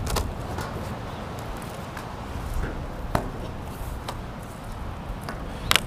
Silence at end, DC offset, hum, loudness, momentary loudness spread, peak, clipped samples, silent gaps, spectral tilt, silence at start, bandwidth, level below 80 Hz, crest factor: 0 s; under 0.1%; none; -33 LUFS; 7 LU; 0 dBFS; under 0.1%; none; -4 dB/octave; 0 s; 16 kHz; -36 dBFS; 30 dB